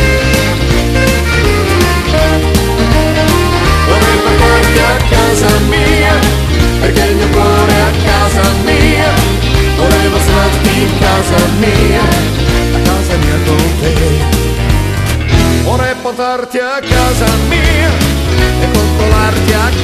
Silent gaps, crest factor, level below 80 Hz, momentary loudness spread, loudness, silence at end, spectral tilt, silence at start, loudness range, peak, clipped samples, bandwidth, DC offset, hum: none; 10 dB; -14 dBFS; 3 LU; -10 LUFS; 0 s; -5 dB/octave; 0 s; 3 LU; 0 dBFS; 0.3%; 14.5 kHz; under 0.1%; none